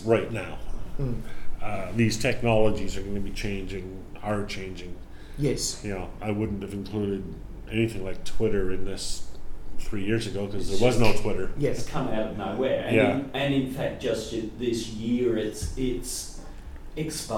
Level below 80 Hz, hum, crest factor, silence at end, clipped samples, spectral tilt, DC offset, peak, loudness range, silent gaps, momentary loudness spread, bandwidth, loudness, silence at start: -36 dBFS; none; 20 dB; 0 s; under 0.1%; -5.5 dB/octave; under 0.1%; -6 dBFS; 5 LU; none; 16 LU; 15.5 kHz; -28 LUFS; 0 s